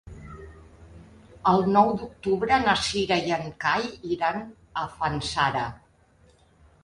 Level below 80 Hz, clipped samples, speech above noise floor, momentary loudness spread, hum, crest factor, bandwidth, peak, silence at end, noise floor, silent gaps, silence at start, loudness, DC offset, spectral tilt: -50 dBFS; under 0.1%; 34 dB; 14 LU; none; 20 dB; 11.5 kHz; -6 dBFS; 1.05 s; -59 dBFS; none; 0.05 s; -25 LUFS; under 0.1%; -4.5 dB/octave